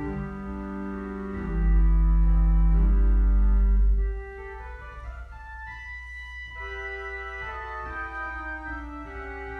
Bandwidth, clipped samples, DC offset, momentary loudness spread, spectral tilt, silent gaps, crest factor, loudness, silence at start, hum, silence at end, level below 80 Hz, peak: 3.2 kHz; under 0.1%; under 0.1%; 16 LU; -9 dB/octave; none; 12 dB; -28 LUFS; 0 s; none; 0 s; -26 dBFS; -12 dBFS